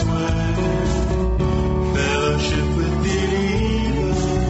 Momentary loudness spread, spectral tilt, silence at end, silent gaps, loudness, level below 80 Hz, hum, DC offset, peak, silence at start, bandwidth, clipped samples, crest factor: 2 LU; -6 dB/octave; 0 s; none; -20 LUFS; -24 dBFS; none; under 0.1%; -8 dBFS; 0 s; 8.2 kHz; under 0.1%; 12 dB